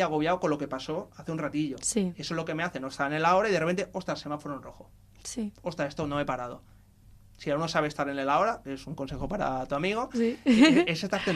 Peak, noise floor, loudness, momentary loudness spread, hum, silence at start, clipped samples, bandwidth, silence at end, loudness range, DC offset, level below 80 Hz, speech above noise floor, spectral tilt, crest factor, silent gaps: -6 dBFS; -55 dBFS; -28 LUFS; 13 LU; none; 0 s; under 0.1%; 14 kHz; 0 s; 9 LU; under 0.1%; -54 dBFS; 27 dB; -5 dB/octave; 22 dB; none